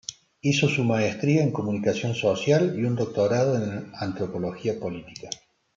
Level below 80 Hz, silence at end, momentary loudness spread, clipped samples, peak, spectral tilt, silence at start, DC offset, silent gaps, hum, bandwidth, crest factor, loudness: -64 dBFS; 0.4 s; 14 LU; under 0.1%; -8 dBFS; -6 dB/octave; 0.1 s; under 0.1%; none; none; 7.8 kHz; 18 dB; -25 LUFS